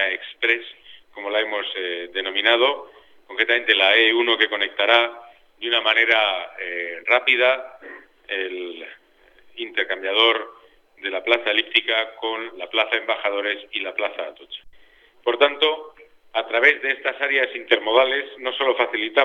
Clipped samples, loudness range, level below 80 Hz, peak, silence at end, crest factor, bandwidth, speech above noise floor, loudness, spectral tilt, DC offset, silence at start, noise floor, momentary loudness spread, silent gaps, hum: under 0.1%; 6 LU; -70 dBFS; 0 dBFS; 0 s; 22 dB; 7.8 kHz; 32 dB; -20 LUFS; -2 dB/octave; under 0.1%; 0 s; -53 dBFS; 16 LU; none; none